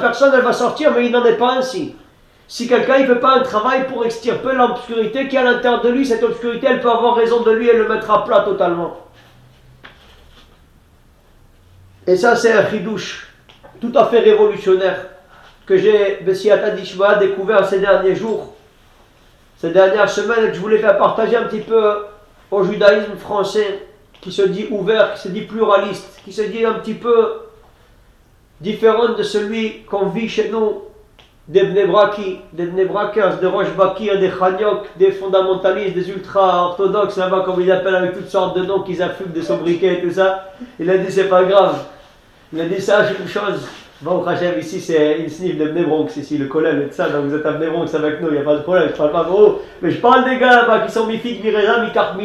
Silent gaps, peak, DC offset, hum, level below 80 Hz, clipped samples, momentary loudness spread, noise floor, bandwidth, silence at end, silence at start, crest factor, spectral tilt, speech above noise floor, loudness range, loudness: none; 0 dBFS; under 0.1%; none; -52 dBFS; under 0.1%; 11 LU; -50 dBFS; 12 kHz; 0 s; 0 s; 16 dB; -5.5 dB/octave; 35 dB; 4 LU; -16 LUFS